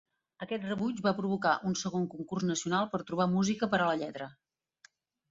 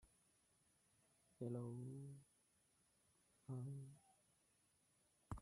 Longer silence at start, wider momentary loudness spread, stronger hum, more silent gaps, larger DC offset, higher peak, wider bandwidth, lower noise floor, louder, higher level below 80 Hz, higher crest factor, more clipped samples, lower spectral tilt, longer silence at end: first, 0.4 s vs 0.05 s; second, 10 LU vs 13 LU; neither; neither; neither; first, -14 dBFS vs -36 dBFS; second, 7.8 kHz vs 13 kHz; second, -65 dBFS vs -81 dBFS; first, -32 LUFS vs -54 LUFS; first, -68 dBFS vs -76 dBFS; about the same, 18 dB vs 22 dB; neither; second, -5 dB/octave vs -8 dB/octave; first, 1 s vs 0 s